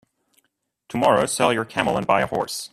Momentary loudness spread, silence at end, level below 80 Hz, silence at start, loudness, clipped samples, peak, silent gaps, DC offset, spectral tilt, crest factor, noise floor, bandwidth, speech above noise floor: 6 LU; 0.05 s; -56 dBFS; 0.9 s; -21 LUFS; under 0.1%; -2 dBFS; none; under 0.1%; -4 dB/octave; 20 dB; -73 dBFS; 15.5 kHz; 52 dB